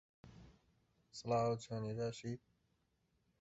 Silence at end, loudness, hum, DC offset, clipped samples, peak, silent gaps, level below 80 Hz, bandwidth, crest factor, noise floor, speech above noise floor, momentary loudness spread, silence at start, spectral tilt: 1.05 s; -42 LUFS; none; under 0.1%; under 0.1%; -26 dBFS; none; -72 dBFS; 8 kHz; 20 dB; -81 dBFS; 41 dB; 20 LU; 0.25 s; -6.5 dB/octave